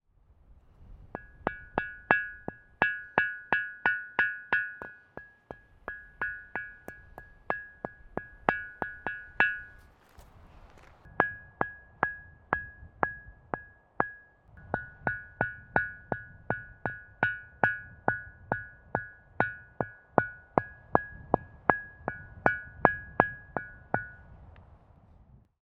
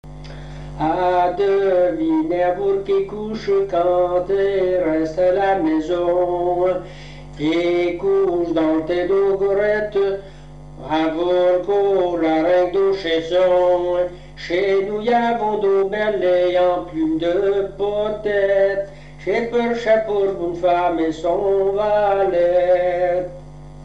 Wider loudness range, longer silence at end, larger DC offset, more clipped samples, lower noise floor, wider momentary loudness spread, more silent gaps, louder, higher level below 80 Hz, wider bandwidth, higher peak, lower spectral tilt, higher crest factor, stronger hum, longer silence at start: first, 6 LU vs 2 LU; first, 1 s vs 0 s; second, under 0.1% vs 0.6%; neither; first, -62 dBFS vs -38 dBFS; first, 18 LU vs 7 LU; neither; second, -32 LUFS vs -19 LUFS; second, -56 dBFS vs -44 dBFS; about the same, 8 kHz vs 8 kHz; first, 0 dBFS vs -6 dBFS; about the same, -7.5 dB/octave vs -6.5 dB/octave; first, 34 dB vs 12 dB; second, none vs 50 Hz at -40 dBFS; first, 0.8 s vs 0.05 s